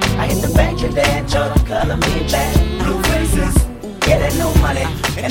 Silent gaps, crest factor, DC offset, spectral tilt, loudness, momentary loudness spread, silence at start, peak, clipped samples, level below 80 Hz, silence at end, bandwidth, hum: none; 14 dB; under 0.1%; -5 dB/octave; -16 LUFS; 3 LU; 0 s; 0 dBFS; under 0.1%; -20 dBFS; 0 s; 17 kHz; none